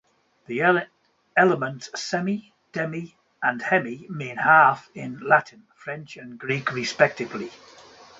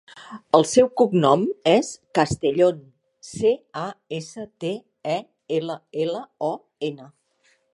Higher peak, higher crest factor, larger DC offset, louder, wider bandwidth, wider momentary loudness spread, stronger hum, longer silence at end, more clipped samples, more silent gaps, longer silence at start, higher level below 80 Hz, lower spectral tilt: about the same, -2 dBFS vs -2 dBFS; about the same, 22 dB vs 22 dB; neither; about the same, -23 LUFS vs -23 LUFS; second, 8 kHz vs 11.5 kHz; about the same, 17 LU vs 15 LU; neither; about the same, 0.65 s vs 0.7 s; neither; neither; first, 0.5 s vs 0.15 s; second, -70 dBFS vs -58 dBFS; about the same, -5 dB/octave vs -5.5 dB/octave